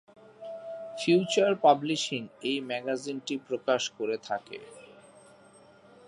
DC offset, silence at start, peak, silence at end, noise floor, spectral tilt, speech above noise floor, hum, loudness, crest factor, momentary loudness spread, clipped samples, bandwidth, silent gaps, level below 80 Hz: under 0.1%; 0.4 s; -8 dBFS; 1.15 s; -56 dBFS; -4 dB/octave; 28 dB; none; -28 LUFS; 22 dB; 19 LU; under 0.1%; 11 kHz; none; -80 dBFS